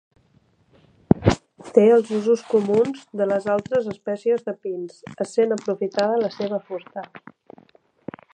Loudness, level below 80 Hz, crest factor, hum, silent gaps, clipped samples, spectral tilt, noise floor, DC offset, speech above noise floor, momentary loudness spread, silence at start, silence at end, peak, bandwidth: -22 LUFS; -48 dBFS; 22 dB; none; none; under 0.1%; -7 dB/octave; -60 dBFS; under 0.1%; 39 dB; 17 LU; 1.1 s; 1.15 s; 0 dBFS; 9.4 kHz